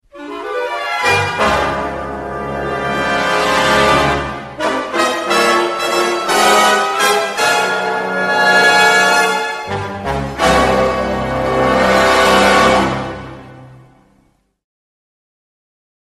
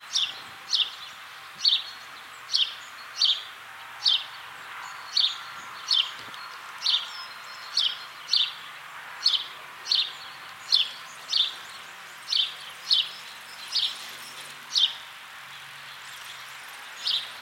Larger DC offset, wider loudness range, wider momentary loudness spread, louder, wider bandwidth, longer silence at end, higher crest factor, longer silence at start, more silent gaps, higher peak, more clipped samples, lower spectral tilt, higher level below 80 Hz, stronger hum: neither; about the same, 4 LU vs 3 LU; second, 12 LU vs 17 LU; first, -13 LUFS vs -25 LUFS; second, 13 kHz vs 16 kHz; first, 2.3 s vs 0 s; second, 14 dB vs 24 dB; first, 0.15 s vs 0 s; neither; first, 0 dBFS vs -6 dBFS; neither; first, -3 dB/octave vs 2 dB/octave; first, -36 dBFS vs -82 dBFS; neither